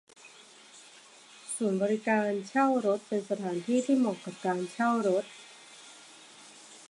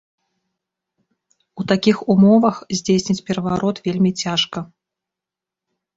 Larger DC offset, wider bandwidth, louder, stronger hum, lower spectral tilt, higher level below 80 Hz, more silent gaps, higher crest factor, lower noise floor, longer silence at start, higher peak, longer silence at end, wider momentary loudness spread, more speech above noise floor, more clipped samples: neither; first, 11.5 kHz vs 7.8 kHz; second, -29 LUFS vs -18 LUFS; neither; about the same, -5 dB/octave vs -5.5 dB/octave; second, -86 dBFS vs -56 dBFS; neither; about the same, 18 dB vs 18 dB; second, -54 dBFS vs -86 dBFS; second, 0.25 s vs 1.55 s; second, -14 dBFS vs -2 dBFS; second, 0.05 s vs 1.3 s; first, 24 LU vs 11 LU; second, 26 dB vs 69 dB; neither